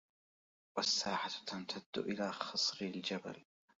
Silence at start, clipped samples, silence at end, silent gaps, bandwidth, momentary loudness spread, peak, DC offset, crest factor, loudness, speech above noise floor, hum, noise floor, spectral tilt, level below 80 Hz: 0.75 s; under 0.1%; 0.35 s; 1.86-1.93 s; 7.6 kHz; 10 LU; -20 dBFS; under 0.1%; 22 dB; -38 LUFS; over 50 dB; none; under -90 dBFS; -1.5 dB/octave; -80 dBFS